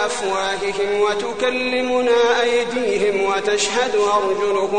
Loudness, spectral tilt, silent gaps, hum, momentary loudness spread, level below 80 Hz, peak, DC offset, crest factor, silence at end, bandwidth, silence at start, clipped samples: -19 LUFS; -2.5 dB/octave; none; none; 5 LU; -52 dBFS; -6 dBFS; 0.9%; 12 dB; 0 s; 10 kHz; 0 s; under 0.1%